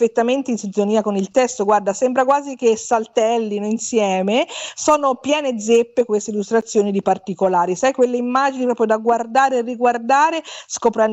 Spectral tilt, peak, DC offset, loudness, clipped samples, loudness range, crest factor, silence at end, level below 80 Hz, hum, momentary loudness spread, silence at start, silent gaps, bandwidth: -4 dB/octave; -4 dBFS; under 0.1%; -18 LUFS; under 0.1%; 1 LU; 14 dB; 0 s; -62 dBFS; none; 5 LU; 0 s; none; 8.4 kHz